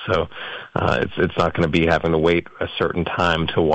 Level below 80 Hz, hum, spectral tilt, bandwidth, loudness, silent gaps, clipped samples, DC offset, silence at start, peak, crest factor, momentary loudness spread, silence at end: -44 dBFS; none; -6.5 dB/octave; 8.2 kHz; -20 LUFS; none; under 0.1%; under 0.1%; 0 s; -6 dBFS; 14 dB; 8 LU; 0 s